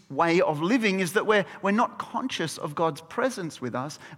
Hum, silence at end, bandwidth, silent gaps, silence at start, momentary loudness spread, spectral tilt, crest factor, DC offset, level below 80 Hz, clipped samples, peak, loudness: none; 0 s; 17 kHz; none; 0.1 s; 10 LU; -5 dB/octave; 18 dB; under 0.1%; -70 dBFS; under 0.1%; -8 dBFS; -26 LUFS